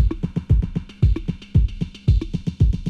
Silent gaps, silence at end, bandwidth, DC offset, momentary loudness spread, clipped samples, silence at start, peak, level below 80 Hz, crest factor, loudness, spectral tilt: none; 0 s; 6.6 kHz; under 0.1%; 6 LU; under 0.1%; 0 s; -6 dBFS; -22 dBFS; 14 dB; -22 LUFS; -9 dB/octave